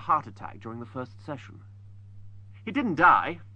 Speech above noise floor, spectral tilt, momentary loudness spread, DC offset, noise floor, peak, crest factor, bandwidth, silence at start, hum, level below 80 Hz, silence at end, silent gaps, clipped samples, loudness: 19 dB; -7 dB/octave; 21 LU; under 0.1%; -46 dBFS; -8 dBFS; 20 dB; 8.4 kHz; 0 s; none; -60 dBFS; 0 s; none; under 0.1%; -24 LUFS